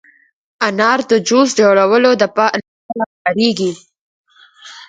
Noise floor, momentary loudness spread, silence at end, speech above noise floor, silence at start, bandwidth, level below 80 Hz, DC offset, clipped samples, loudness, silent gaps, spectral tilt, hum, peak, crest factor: -41 dBFS; 12 LU; 0.05 s; 28 dB; 0.6 s; 9.4 kHz; -64 dBFS; under 0.1%; under 0.1%; -14 LUFS; 2.68-2.89 s, 3.06-3.25 s, 3.99-4.24 s; -4 dB/octave; none; 0 dBFS; 16 dB